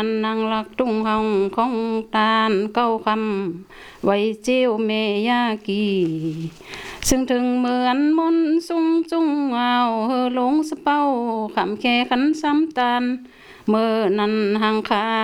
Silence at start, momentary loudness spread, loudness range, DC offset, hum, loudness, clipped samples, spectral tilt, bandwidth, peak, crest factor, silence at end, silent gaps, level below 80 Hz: 0 s; 6 LU; 2 LU; under 0.1%; none; -20 LUFS; under 0.1%; -4.5 dB/octave; over 20 kHz; -4 dBFS; 16 dB; 0 s; none; -48 dBFS